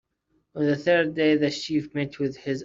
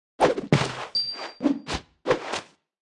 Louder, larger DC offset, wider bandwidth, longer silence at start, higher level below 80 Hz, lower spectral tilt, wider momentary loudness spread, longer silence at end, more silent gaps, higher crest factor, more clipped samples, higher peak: about the same, -24 LUFS vs -26 LUFS; neither; second, 7.6 kHz vs 11.5 kHz; first, 0.55 s vs 0.2 s; second, -64 dBFS vs -50 dBFS; about the same, -6 dB/octave vs -5 dB/octave; about the same, 9 LU vs 9 LU; second, 0 s vs 0.45 s; neither; second, 16 dB vs 22 dB; neither; second, -10 dBFS vs -4 dBFS